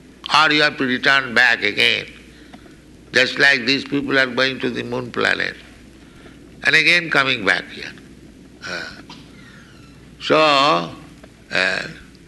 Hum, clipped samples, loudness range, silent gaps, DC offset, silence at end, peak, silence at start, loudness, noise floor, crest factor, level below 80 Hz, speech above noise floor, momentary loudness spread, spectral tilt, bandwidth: none; under 0.1%; 4 LU; none; under 0.1%; 0.25 s; -2 dBFS; 0.25 s; -16 LUFS; -44 dBFS; 18 dB; -52 dBFS; 26 dB; 16 LU; -3 dB/octave; 12 kHz